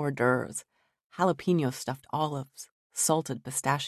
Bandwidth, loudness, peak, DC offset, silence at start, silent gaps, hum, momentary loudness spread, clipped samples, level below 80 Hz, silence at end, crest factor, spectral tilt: 14 kHz; -29 LUFS; -10 dBFS; under 0.1%; 0 s; 1.04-1.10 s, 2.72-2.90 s; none; 13 LU; under 0.1%; -68 dBFS; 0 s; 18 dB; -4.5 dB/octave